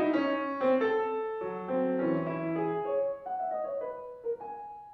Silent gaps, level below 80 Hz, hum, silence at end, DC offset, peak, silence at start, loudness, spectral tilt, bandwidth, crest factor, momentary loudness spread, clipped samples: none; -72 dBFS; none; 0 s; under 0.1%; -16 dBFS; 0 s; -32 LUFS; -8.5 dB/octave; 6 kHz; 14 dB; 10 LU; under 0.1%